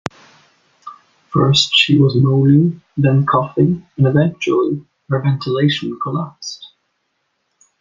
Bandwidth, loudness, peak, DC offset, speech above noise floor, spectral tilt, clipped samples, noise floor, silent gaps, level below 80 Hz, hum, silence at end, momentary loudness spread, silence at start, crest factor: 7.6 kHz; -15 LUFS; -2 dBFS; under 0.1%; 54 dB; -6 dB/octave; under 0.1%; -69 dBFS; none; -52 dBFS; none; 1.15 s; 14 LU; 0.85 s; 16 dB